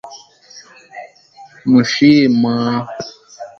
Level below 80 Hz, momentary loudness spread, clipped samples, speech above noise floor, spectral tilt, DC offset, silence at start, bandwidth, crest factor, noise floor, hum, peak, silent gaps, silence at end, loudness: -58 dBFS; 25 LU; under 0.1%; 30 dB; -5.5 dB/octave; under 0.1%; 0.05 s; 7 kHz; 16 dB; -43 dBFS; none; 0 dBFS; none; 0.15 s; -13 LUFS